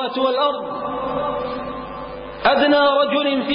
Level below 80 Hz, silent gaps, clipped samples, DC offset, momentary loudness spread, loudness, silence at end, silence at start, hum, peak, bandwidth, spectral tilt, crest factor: -48 dBFS; none; under 0.1%; under 0.1%; 16 LU; -19 LUFS; 0 s; 0 s; none; -6 dBFS; 5.2 kHz; -9.5 dB/octave; 14 dB